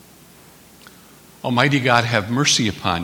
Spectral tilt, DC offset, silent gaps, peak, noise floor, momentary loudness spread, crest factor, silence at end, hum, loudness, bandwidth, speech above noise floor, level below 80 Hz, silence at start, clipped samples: -3.5 dB/octave; under 0.1%; none; 0 dBFS; -47 dBFS; 6 LU; 20 dB; 0 s; none; -17 LUFS; 20 kHz; 29 dB; -52 dBFS; 1.45 s; under 0.1%